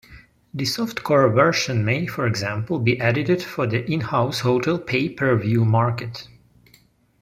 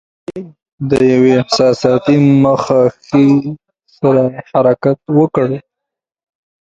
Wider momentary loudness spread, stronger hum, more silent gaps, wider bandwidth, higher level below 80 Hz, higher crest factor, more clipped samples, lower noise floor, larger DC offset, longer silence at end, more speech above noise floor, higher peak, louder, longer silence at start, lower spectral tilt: second, 7 LU vs 16 LU; neither; second, none vs 0.62-0.66 s, 0.72-0.78 s; first, 15.5 kHz vs 9 kHz; second, -56 dBFS vs -50 dBFS; first, 20 dB vs 12 dB; neither; second, -57 dBFS vs -81 dBFS; neither; about the same, 0.95 s vs 1.05 s; second, 36 dB vs 70 dB; about the same, -2 dBFS vs 0 dBFS; second, -21 LUFS vs -12 LUFS; second, 0.1 s vs 0.3 s; about the same, -6 dB/octave vs -7 dB/octave